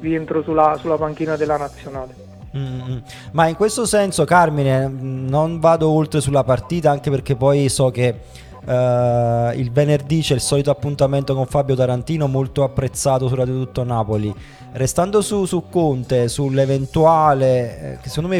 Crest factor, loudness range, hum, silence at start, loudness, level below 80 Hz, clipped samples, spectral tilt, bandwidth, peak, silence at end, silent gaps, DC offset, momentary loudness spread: 18 dB; 4 LU; none; 0 s; -18 LUFS; -42 dBFS; under 0.1%; -6 dB/octave; 15.5 kHz; 0 dBFS; 0 s; none; under 0.1%; 12 LU